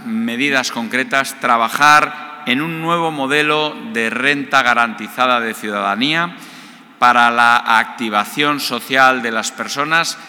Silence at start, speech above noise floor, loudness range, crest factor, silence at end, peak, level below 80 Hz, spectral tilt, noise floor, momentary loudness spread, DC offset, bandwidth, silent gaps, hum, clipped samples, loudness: 0 s; 23 dB; 2 LU; 16 dB; 0 s; 0 dBFS; -66 dBFS; -3 dB/octave; -39 dBFS; 9 LU; under 0.1%; 19.5 kHz; none; none; under 0.1%; -15 LUFS